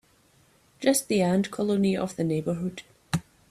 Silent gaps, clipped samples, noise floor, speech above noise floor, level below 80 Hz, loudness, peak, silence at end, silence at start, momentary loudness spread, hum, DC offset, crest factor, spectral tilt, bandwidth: none; under 0.1%; -62 dBFS; 36 dB; -62 dBFS; -27 LUFS; -8 dBFS; 0.3 s; 0.8 s; 9 LU; none; under 0.1%; 20 dB; -5.5 dB/octave; 15 kHz